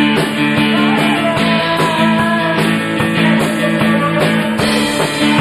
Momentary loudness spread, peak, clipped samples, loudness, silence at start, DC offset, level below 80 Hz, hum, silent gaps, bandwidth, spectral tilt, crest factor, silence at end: 2 LU; -2 dBFS; under 0.1%; -13 LUFS; 0 s; 0.2%; -44 dBFS; none; none; 14.5 kHz; -5 dB/octave; 10 dB; 0 s